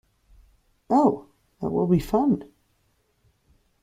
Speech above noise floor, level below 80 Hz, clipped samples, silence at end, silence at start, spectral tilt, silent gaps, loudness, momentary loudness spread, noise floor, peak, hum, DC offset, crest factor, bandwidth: 47 dB; -50 dBFS; under 0.1%; 1.4 s; 0.9 s; -9 dB/octave; none; -24 LUFS; 10 LU; -68 dBFS; -6 dBFS; none; under 0.1%; 20 dB; 15.5 kHz